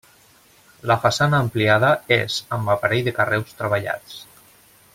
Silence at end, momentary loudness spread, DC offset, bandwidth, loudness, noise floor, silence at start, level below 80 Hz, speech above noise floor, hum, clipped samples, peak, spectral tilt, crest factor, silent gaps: 0.7 s; 12 LU; under 0.1%; 16.5 kHz; -20 LUFS; -53 dBFS; 0.85 s; -54 dBFS; 33 dB; none; under 0.1%; -2 dBFS; -5 dB/octave; 20 dB; none